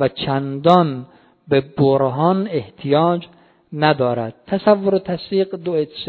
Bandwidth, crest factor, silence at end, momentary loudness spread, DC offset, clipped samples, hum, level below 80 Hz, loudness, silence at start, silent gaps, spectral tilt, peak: 6.8 kHz; 18 dB; 0 s; 9 LU; under 0.1%; under 0.1%; none; -56 dBFS; -18 LUFS; 0 s; none; -9 dB/octave; 0 dBFS